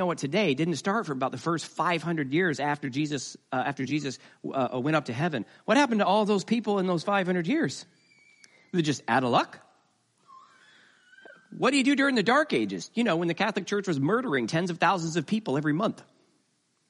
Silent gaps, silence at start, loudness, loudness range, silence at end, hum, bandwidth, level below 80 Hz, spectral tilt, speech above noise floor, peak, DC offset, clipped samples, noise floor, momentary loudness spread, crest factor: none; 0 s; -27 LUFS; 4 LU; 0.9 s; none; 11.5 kHz; -74 dBFS; -5.5 dB/octave; 45 dB; -10 dBFS; under 0.1%; under 0.1%; -72 dBFS; 8 LU; 18 dB